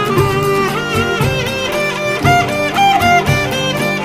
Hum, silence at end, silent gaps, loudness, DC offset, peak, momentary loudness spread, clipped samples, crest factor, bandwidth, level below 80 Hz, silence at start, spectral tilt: none; 0 s; none; -14 LUFS; under 0.1%; 0 dBFS; 5 LU; under 0.1%; 14 dB; 15.5 kHz; -36 dBFS; 0 s; -4.5 dB/octave